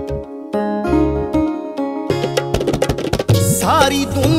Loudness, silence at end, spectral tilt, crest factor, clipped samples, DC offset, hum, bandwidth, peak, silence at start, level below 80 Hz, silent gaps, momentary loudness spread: -17 LUFS; 0 s; -5.5 dB/octave; 16 dB; under 0.1%; under 0.1%; none; 16 kHz; 0 dBFS; 0 s; -32 dBFS; none; 9 LU